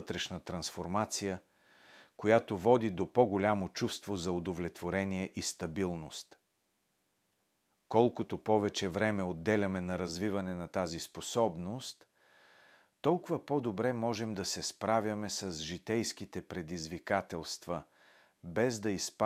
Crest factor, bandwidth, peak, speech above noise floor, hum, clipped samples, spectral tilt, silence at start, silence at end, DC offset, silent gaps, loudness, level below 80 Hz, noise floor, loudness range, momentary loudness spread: 24 dB; 15.5 kHz; -12 dBFS; 45 dB; none; under 0.1%; -5 dB/octave; 0 s; 0 s; under 0.1%; none; -34 LUFS; -64 dBFS; -79 dBFS; 6 LU; 11 LU